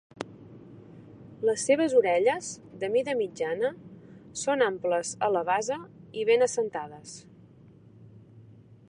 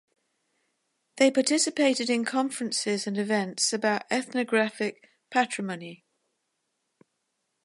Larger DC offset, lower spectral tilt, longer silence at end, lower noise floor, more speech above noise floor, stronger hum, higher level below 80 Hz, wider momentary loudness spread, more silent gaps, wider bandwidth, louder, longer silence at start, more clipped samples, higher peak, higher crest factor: neither; about the same, -3.5 dB/octave vs -3 dB/octave; second, 0.45 s vs 1.7 s; second, -53 dBFS vs -79 dBFS; second, 27 dB vs 52 dB; neither; first, -70 dBFS vs -80 dBFS; first, 22 LU vs 10 LU; neither; about the same, 11 kHz vs 11.5 kHz; about the same, -27 LUFS vs -26 LUFS; second, 0.15 s vs 1.15 s; neither; about the same, -10 dBFS vs -8 dBFS; about the same, 18 dB vs 20 dB